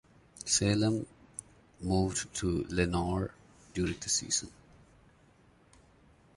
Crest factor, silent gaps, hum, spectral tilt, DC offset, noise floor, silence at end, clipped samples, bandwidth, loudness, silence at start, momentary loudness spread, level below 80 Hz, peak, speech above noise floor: 22 dB; none; none; -4 dB/octave; under 0.1%; -63 dBFS; 1.85 s; under 0.1%; 11.5 kHz; -32 LUFS; 0.4 s; 16 LU; -50 dBFS; -12 dBFS; 32 dB